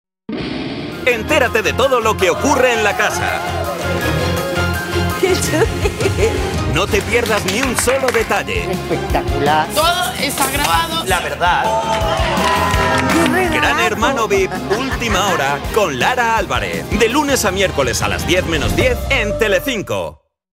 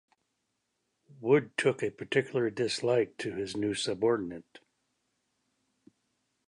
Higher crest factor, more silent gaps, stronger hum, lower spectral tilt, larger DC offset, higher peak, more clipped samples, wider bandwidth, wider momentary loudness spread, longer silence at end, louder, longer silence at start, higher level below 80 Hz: second, 16 dB vs 22 dB; neither; neither; about the same, -4 dB/octave vs -5 dB/octave; neither; first, 0 dBFS vs -12 dBFS; neither; first, 16.5 kHz vs 11 kHz; second, 6 LU vs 9 LU; second, 0.4 s vs 2.05 s; first, -16 LUFS vs -30 LUFS; second, 0.3 s vs 1.2 s; first, -30 dBFS vs -70 dBFS